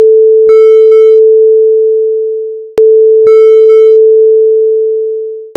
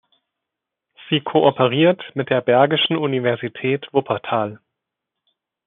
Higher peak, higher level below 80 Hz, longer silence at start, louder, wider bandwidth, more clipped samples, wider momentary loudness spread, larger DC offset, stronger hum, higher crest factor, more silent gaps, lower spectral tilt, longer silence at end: about the same, 0 dBFS vs -2 dBFS; first, -58 dBFS vs -70 dBFS; second, 0 s vs 1 s; first, -5 LUFS vs -19 LUFS; about the same, 4.2 kHz vs 4.1 kHz; first, 5% vs under 0.1%; about the same, 10 LU vs 8 LU; neither; neither; second, 4 dB vs 18 dB; neither; first, -5 dB/octave vs -3.5 dB/octave; second, 0.1 s vs 1.1 s